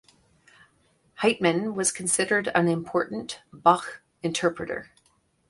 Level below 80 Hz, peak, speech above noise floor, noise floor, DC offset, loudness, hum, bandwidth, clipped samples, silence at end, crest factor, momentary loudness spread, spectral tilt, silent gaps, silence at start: -64 dBFS; -4 dBFS; 42 dB; -67 dBFS; under 0.1%; -25 LUFS; none; 11.5 kHz; under 0.1%; 0.65 s; 24 dB; 12 LU; -3.5 dB/octave; none; 1.2 s